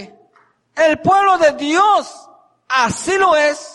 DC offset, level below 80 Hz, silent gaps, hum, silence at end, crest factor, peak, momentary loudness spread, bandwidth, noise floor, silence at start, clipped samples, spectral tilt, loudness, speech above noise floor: under 0.1%; -54 dBFS; none; none; 0.05 s; 12 dB; -2 dBFS; 6 LU; 11.5 kHz; -56 dBFS; 0 s; under 0.1%; -3.5 dB/octave; -14 LUFS; 41 dB